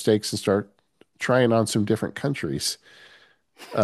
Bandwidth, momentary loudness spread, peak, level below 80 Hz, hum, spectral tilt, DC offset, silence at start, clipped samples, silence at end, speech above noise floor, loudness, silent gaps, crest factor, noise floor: 13 kHz; 11 LU; -6 dBFS; -62 dBFS; none; -5 dB/octave; under 0.1%; 0 s; under 0.1%; 0 s; 33 dB; -24 LUFS; none; 18 dB; -56 dBFS